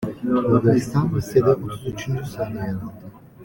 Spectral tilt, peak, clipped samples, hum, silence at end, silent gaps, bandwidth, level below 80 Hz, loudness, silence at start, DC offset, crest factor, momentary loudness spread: -8 dB/octave; -4 dBFS; under 0.1%; none; 0 s; none; 17 kHz; -46 dBFS; -22 LUFS; 0 s; under 0.1%; 18 dB; 12 LU